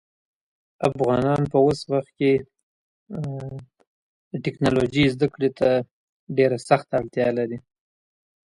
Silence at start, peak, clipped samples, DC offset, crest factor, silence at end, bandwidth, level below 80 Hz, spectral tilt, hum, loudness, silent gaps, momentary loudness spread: 0.8 s; -2 dBFS; under 0.1%; under 0.1%; 22 dB; 0.95 s; 11.5 kHz; -52 dBFS; -7 dB/octave; none; -23 LUFS; 2.63-3.06 s, 3.87-4.31 s, 5.91-6.27 s; 14 LU